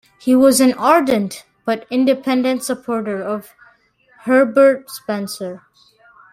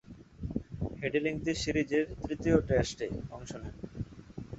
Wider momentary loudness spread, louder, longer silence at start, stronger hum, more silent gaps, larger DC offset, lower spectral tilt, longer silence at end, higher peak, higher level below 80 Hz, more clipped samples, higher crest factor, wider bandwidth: about the same, 15 LU vs 15 LU; first, -16 LUFS vs -33 LUFS; first, 0.25 s vs 0.05 s; neither; neither; neither; second, -4 dB/octave vs -6 dB/octave; first, 0.75 s vs 0 s; first, -2 dBFS vs -10 dBFS; second, -60 dBFS vs -48 dBFS; neither; second, 16 dB vs 22 dB; first, 16 kHz vs 8.2 kHz